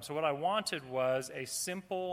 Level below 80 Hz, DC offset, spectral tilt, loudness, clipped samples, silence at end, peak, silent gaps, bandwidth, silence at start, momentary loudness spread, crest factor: -76 dBFS; under 0.1%; -3 dB/octave; -35 LUFS; under 0.1%; 0 s; -18 dBFS; none; 16 kHz; 0 s; 5 LU; 16 dB